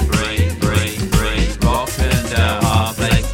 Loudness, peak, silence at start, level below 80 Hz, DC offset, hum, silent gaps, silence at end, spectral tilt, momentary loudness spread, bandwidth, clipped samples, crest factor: -17 LUFS; 0 dBFS; 0 s; -22 dBFS; under 0.1%; none; none; 0 s; -5 dB/octave; 2 LU; 17 kHz; under 0.1%; 16 dB